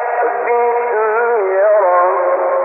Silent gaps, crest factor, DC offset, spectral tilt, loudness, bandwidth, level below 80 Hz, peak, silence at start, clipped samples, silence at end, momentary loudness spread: none; 10 dB; under 0.1%; -8 dB/octave; -14 LUFS; 2.9 kHz; under -90 dBFS; -2 dBFS; 0 s; under 0.1%; 0 s; 4 LU